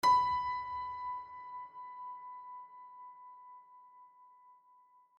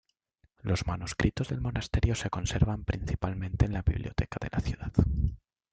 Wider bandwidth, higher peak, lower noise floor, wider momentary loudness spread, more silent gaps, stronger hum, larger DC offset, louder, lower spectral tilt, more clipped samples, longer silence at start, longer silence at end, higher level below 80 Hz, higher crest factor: first, 11.5 kHz vs 9.2 kHz; second, -20 dBFS vs -10 dBFS; second, -65 dBFS vs -70 dBFS; first, 24 LU vs 5 LU; neither; neither; neither; second, -37 LUFS vs -31 LUFS; second, -2.5 dB/octave vs -6 dB/octave; neither; second, 0.05 s vs 0.65 s; first, 0.65 s vs 0.35 s; second, -68 dBFS vs -36 dBFS; about the same, 20 dB vs 20 dB